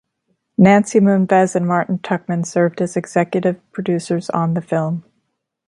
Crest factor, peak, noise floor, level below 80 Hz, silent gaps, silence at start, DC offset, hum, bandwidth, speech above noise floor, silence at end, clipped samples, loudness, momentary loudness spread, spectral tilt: 16 dB; 0 dBFS; -71 dBFS; -60 dBFS; none; 0.6 s; under 0.1%; none; 11.5 kHz; 55 dB; 0.65 s; under 0.1%; -17 LUFS; 9 LU; -7 dB/octave